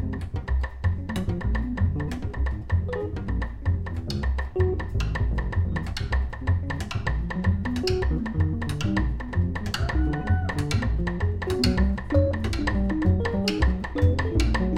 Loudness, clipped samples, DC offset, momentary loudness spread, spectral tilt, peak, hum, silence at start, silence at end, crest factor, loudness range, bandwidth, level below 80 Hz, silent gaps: -26 LUFS; under 0.1%; under 0.1%; 6 LU; -6.5 dB/octave; -8 dBFS; none; 0 s; 0 s; 16 dB; 4 LU; 12 kHz; -30 dBFS; none